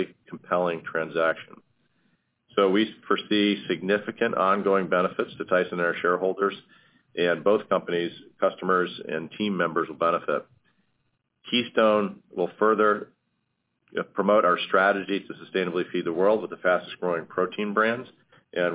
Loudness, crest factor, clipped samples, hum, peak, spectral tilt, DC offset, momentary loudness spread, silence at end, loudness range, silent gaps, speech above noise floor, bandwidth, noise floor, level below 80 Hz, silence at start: -25 LUFS; 20 dB; under 0.1%; none; -6 dBFS; -9 dB/octave; under 0.1%; 10 LU; 0 s; 3 LU; none; 51 dB; 4 kHz; -76 dBFS; -72 dBFS; 0 s